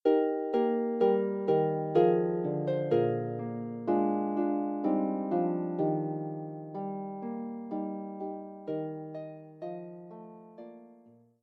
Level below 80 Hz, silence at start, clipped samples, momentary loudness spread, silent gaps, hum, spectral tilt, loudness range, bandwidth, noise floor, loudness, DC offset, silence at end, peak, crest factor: -82 dBFS; 0.05 s; under 0.1%; 16 LU; none; none; -10.5 dB/octave; 11 LU; 5 kHz; -59 dBFS; -31 LUFS; under 0.1%; 0.5 s; -12 dBFS; 18 dB